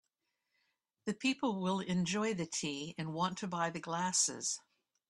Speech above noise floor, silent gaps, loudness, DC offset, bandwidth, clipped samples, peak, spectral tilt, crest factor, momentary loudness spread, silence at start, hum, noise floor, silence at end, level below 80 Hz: 50 dB; none; -36 LUFS; under 0.1%; 12 kHz; under 0.1%; -18 dBFS; -3.5 dB/octave; 20 dB; 10 LU; 1.05 s; none; -86 dBFS; 0.5 s; -76 dBFS